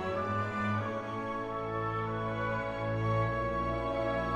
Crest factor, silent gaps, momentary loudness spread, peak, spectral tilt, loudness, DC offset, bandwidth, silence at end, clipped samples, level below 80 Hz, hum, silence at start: 14 dB; none; 5 LU; -20 dBFS; -7.5 dB/octave; -33 LUFS; under 0.1%; 8.2 kHz; 0 s; under 0.1%; -48 dBFS; none; 0 s